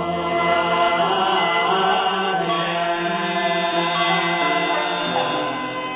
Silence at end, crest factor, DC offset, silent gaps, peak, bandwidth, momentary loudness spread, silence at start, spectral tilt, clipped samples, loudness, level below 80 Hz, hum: 0 s; 14 dB; under 0.1%; none; -8 dBFS; 4 kHz; 4 LU; 0 s; -8 dB/octave; under 0.1%; -20 LUFS; -56 dBFS; none